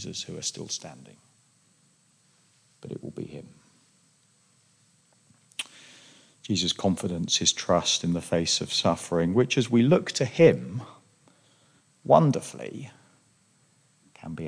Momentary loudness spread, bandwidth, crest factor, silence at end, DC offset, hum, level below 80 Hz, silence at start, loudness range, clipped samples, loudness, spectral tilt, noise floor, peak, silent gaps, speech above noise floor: 22 LU; 10.5 kHz; 24 dB; 0 s; under 0.1%; none; -62 dBFS; 0 s; 21 LU; under 0.1%; -25 LUFS; -4.5 dB/octave; -64 dBFS; -4 dBFS; none; 39 dB